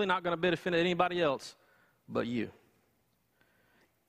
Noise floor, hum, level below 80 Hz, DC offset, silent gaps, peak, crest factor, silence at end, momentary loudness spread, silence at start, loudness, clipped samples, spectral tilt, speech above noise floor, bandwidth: -74 dBFS; none; -68 dBFS; under 0.1%; none; -12 dBFS; 22 dB; 1.6 s; 10 LU; 0 s; -32 LUFS; under 0.1%; -5.5 dB/octave; 43 dB; 14 kHz